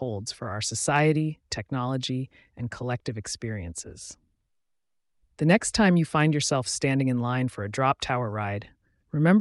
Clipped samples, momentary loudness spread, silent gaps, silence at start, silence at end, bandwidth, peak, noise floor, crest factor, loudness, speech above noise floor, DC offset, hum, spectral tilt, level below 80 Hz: under 0.1%; 15 LU; none; 0 s; 0 s; 11.5 kHz; -8 dBFS; -75 dBFS; 18 dB; -26 LUFS; 49 dB; under 0.1%; none; -5 dB/octave; -54 dBFS